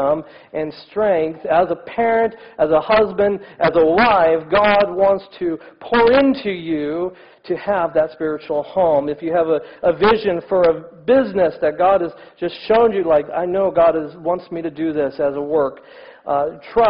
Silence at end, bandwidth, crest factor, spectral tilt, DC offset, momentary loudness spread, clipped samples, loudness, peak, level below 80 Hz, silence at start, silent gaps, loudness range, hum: 0 s; 5.4 kHz; 12 dB; -8.5 dB/octave; under 0.1%; 10 LU; under 0.1%; -18 LUFS; -4 dBFS; -48 dBFS; 0 s; none; 4 LU; none